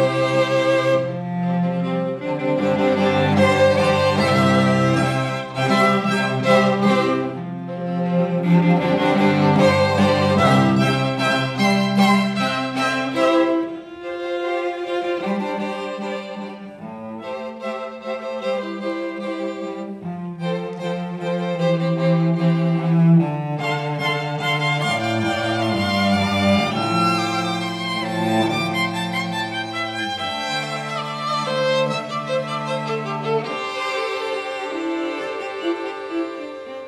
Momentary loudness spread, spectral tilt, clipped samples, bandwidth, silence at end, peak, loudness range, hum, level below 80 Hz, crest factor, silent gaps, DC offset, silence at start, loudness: 12 LU; -6 dB/octave; under 0.1%; 13.5 kHz; 0 s; -2 dBFS; 10 LU; none; -60 dBFS; 18 dB; none; under 0.1%; 0 s; -20 LUFS